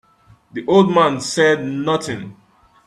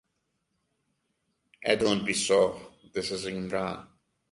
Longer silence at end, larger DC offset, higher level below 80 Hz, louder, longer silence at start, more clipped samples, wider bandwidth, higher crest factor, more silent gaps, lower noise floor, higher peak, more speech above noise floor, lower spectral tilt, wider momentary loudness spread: about the same, 0.55 s vs 0.45 s; neither; about the same, -58 dBFS vs -62 dBFS; first, -17 LUFS vs -28 LUFS; second, 0.55 s vs 1.6 s; neither; first, 13 kHz vs 11.5 kHz; second, 18 dB vs 24 dB; neither; second, -52 dBFS vs -78 dBFS; first, -2 dBFS vs -8 dBFS; second, 35 dB vs 51 dB; first, -5 dB/octave vs -3.5 dB/octave; first, 16 LU vs 12 LU